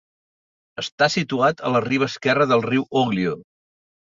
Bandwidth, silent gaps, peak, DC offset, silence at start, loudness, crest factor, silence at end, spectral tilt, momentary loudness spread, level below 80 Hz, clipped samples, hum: 7.6 kHz; 0.92-0.98 s; -4 dBFS; under 0.1%; 0.8 s; -21 LUFS; 18 dB; 0.7 s; -5.5 dB/octave; 13 LU; -60 dBFS; under 0.1%; none